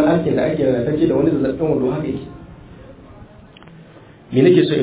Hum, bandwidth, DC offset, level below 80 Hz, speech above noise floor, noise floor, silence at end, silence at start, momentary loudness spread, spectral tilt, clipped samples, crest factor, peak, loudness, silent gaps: none; 4 kHz; under 0.1%; -44 dBFS; 27 dB; -43 dBFS; 0 s; 0 s; 14 LU; -12 dB/octave; under 0.1%; 16 dB; -2 dBFS; -17 LUFS; none